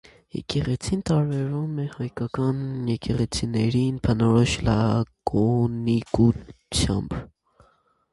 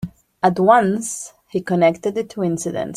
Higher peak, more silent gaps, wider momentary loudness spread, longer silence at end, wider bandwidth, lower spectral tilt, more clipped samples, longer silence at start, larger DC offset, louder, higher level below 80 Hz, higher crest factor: second, -6 dBFS vs -2 dBFS; neither; second, 9 LU vs 13 LU; first, 0.85 s vs 0 s; second, 11.5 kHz vs 15 kHz; about the same, -6.5 dB/octave vs -5.5 dB/octave; neither; first, 0.35 s vs 0 s; neither; second, -24 LUFS vs -19 LUFS; first, -40 dBFS vs -56 dBFS; about the same, 18 dB vs 18 dB